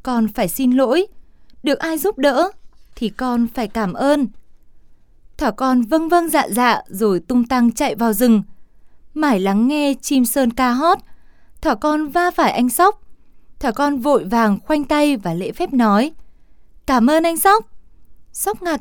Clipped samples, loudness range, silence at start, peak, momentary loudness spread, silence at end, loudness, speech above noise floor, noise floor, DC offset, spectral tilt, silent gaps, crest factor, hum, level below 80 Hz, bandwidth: under 0.1%; 3 LU; 0.05 s; -2 dBFS; 8 LU; 0 s; -17 LUFS; 30 dB; -46 dBFS; under 0.1%; -4.5 dB/octave; none; 14 dB; none; -44 dBFS; 19.5 kHz